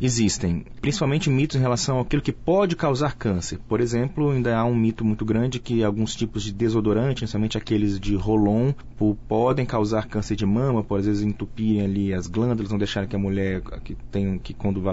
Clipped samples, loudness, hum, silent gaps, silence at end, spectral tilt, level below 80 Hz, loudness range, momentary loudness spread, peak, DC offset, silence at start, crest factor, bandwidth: under 0.1%; -23 LUFS; none; none; 0 s; -6.5 dB/octave; -40 dBFS; 2 LU; 6 LU; -10 dBFS; under 0.1%; 0 s; 12 dB; 8 kHz